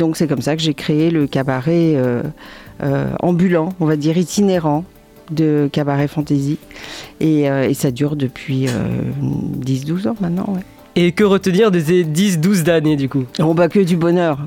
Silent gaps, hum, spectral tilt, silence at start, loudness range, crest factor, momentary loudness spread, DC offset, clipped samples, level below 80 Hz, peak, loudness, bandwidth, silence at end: none; none; -6.5 dB/octave; 0 s; 4 LU; 14 dB; 9 LU; under 0.1%; under 0.1%; -48 dBFS; -2 dBFS; -17 LUFS; 17 kHz; 0 s